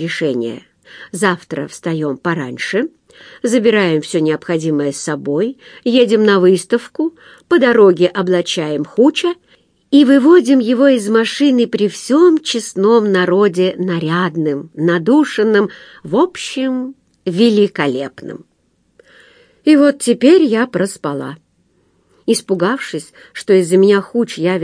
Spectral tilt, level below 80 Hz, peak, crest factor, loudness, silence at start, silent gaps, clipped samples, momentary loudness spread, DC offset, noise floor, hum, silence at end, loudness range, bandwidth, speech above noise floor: -5.5 dB/octave; -64 dBFS; 0 dBFS; 14 dB; -14 LUFS; 0 s; none; under 0.1%; 13 LU; under 0.1%; -58 dBFS; none; 0 s; 6 LU; 10.5 kHz; 45 dB